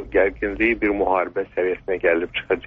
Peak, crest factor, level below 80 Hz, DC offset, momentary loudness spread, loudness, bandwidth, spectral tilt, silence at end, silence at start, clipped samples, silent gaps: -6 dBFS; 16 dB; -42 dBFS; under 0.1%; 4 LU; -21 LUFS; 4.9 kHz; -3 dB/octave; 0 s; 0 s; under 0.1%; none